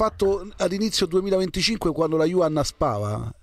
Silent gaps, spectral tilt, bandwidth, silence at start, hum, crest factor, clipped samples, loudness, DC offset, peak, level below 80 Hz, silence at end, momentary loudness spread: none; -5 dB/octave; 15 kHz; 0 s; none; 14 dB; under 0.1%; -23 LUFS; under 0.1%; -8 dBFS; -42 dBFS; 0.1 s; 4 LU